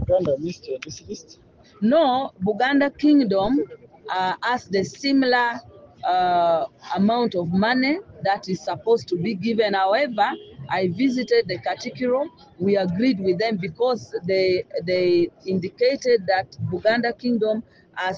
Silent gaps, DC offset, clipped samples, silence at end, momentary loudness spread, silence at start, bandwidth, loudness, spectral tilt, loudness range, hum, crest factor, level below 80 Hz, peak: none; under 0.1%; under 0.1%; 0 s; 10 LU; 0 s; 7.4 kHz; -22 LUFS; -6 dB/octave; 2 LU; none; 16 dB; -54 dBFS; -6 dBFS